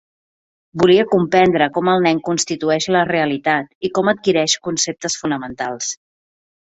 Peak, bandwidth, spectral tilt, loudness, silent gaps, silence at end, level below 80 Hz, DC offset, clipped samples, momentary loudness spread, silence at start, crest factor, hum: 0 dBFS; 8.2 kHz; -4 dB/octave; -17 LUFS; 3.75-3.81 s; 0.7 s; -54 dBFS; under 0.1%; under 0.1%; 10 LU; 0.75 s; 18 dB; none